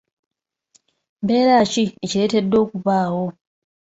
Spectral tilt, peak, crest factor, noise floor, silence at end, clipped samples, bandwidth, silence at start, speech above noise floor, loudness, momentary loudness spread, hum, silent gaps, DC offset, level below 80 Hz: -5.5 dB/octave; -4 dBFS; 16 dB; -61 dBFS; 0.65 s; under 0.1%; 8 kHz; 1.2 s; 43 dB; -19 LUFS; 10 LU; none; none; under 0.1%; -58 dBFS